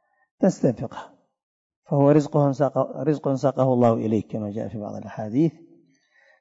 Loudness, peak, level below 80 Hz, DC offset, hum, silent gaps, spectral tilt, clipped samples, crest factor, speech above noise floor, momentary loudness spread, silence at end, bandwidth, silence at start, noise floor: -23 LUFS; -6 dBFS; -64 dBFS; under 0.1%; none; 1.43-1.70 s, 1.76-1.82 s; -8.5 dB/octave; under 0.1%; 18 dB; 38 dB; 14 LU; 0.9 s; 7.8 kHz; 0.4 s; -60 dBFS